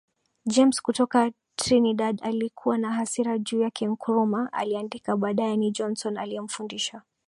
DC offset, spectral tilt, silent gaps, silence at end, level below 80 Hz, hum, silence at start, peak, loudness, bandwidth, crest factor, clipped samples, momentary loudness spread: under 0.1%; -4.5 dB/octave; none; 0.25 s; -66 dBFS; none; 0.45 s; -8 dBFS; -26 LUFS; 11.5 kHz; 18 dB; under 0.1%; 9 LU